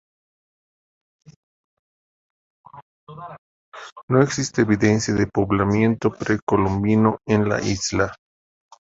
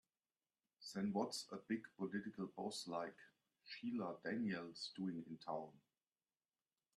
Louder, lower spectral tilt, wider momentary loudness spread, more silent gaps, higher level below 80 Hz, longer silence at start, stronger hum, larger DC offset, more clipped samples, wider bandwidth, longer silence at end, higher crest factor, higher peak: first, -20 LUFS vs -47 LUFS; about the same, -6 dB/octave vs -5 dB/octave; first, 20 LU vs 8 LU; first, 2.82-3.07 s, 3.38-3.72 s, 3.92-3.96 s, 4.03-4.08 s, 6.42-6.47 s vs none; first, -46 dBFS vs -88 dBFS; first, 2.75 s vs 0.8 s; neither; neither; neither; second, 8 kHz vs 12.5 kHz; second, 0.75 s vs 1.2 s; about the same, 20 dB vs 22 dB; first, -2 dBFS vs -28 dBFS